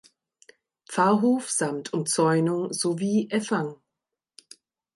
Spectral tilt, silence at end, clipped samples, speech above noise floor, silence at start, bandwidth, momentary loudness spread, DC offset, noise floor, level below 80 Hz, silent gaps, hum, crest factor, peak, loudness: -4.5 dB/octave; 1.2 s; under 0.1%; 62 dB; 0.9 s; 11.5 kHz; 8 LU; under 0.1%; -86 dBFS; -76 dBFS; none; none; 18 dB; -8 dBFS; -25 LUFS